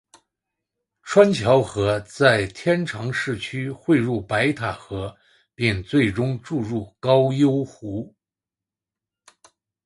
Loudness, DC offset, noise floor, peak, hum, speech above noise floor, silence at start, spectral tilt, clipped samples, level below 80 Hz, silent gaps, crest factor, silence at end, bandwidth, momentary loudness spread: -21 LUFS; under 0.1%; -89 dBFS; -2 dBFS; none; 68 dB; 1.05 s; -6.5 dB/octave; under 0.1%; -50 dBFS; none; 20 dB; 1.75 s; 11.5 kHz; 14 LU